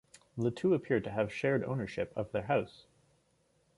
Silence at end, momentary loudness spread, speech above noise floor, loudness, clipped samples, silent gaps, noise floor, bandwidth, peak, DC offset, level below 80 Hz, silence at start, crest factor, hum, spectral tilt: 1.05 s; 7 LU; 40 dB; -33 LUFS; under 0.1%; none; -72 dBFS; 11.5 kHz; -16 dBFS; under 0.1%; -64 dBFS; 0.35 s; 18 dB; none; -7.5 dB/octave